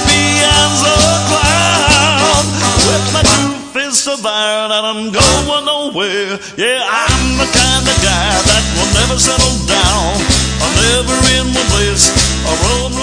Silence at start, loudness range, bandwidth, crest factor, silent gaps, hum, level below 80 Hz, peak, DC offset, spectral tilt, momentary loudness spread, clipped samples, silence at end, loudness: 0 s; 3 LU; 11 kHz; 12 dB; none; none; -22 dBFS; 0 dBFS; under 0.1%; -2.5 dB/octave; 6 LU; 0.1%; 0 s; -10 LUFS